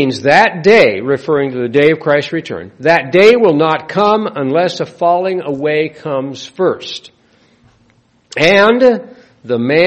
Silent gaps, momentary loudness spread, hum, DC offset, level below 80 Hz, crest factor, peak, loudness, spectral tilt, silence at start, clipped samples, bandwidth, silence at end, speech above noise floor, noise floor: none; 12 LU; none; under 0.1%; -54 dBFS; 12 dB; 0 dBFS; -12 LUFS; -5.5 dB/octave; 0 s; 0.2%; 8.8 kHz; 0 s; 41 dB; -53 dBFS